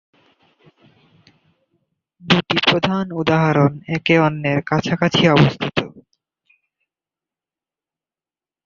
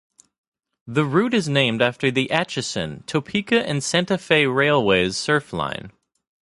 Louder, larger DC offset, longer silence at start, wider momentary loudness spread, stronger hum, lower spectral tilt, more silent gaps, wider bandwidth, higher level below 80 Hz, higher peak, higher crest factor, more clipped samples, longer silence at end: first, -17 LUFS vs -20 LUFS; neither; first, 2.25 s vs 0.85 s; about the same, 9 LU vs 9 LU; neither; first, -6.5 dB/octave vs -4.5 dB/octave; neither; second, 7.2 kHz vs 11.5 kHz; about the same, -52 dBFS vs -54 dBFS; about the same, 0 dBFS vs -2 dBFS; about the same, 20 dB vs 20 dB; neither; first, 2.65 s vs 0.6 s